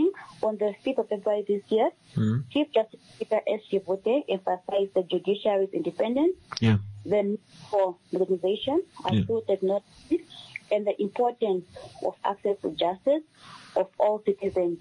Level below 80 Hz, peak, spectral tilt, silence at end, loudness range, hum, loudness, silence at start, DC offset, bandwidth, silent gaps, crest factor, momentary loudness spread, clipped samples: -64 dBFS; -12 dBFS; -7.5 dB/octave; 0 s; 2 LU; none; -27 LUFS; 0 s; under 0.1%; 10.5 kHz; none; 16 dB; 6 LU; under 0.1%